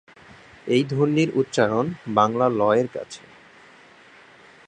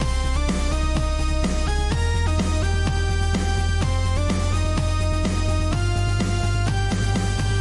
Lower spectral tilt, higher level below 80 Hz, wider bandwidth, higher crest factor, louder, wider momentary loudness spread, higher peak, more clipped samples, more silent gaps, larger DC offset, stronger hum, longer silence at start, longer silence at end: about the same, -6.5 dB/octave vs -5.5 dB/octave; second, -64 dBFS vs -24 dBFS; second, 9.8 kHz vs 11.5 kHz; first, 20 dB vs 10 dB; about the same, -21 LUFS vs -23 LUFS; first, 16 LU vs 1 LU; first, -4 dBFS vs -10 dBFS; neither; neither; neither; neither; first, 0.65 s vs 0 s; first, 1.5 s vs 0 s